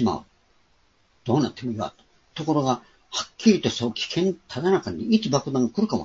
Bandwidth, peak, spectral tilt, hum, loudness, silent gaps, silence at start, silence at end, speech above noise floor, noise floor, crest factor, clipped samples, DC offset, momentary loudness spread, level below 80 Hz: 7.8 kHz; -4 dBFS; -5.5 dB/octave; none; -24 LUFS; none; 0 s; 0 s; 40 dB; -64 dBFS; 20 dB; under 0.1%; under 0.1%; 11 LU; -58 dBFS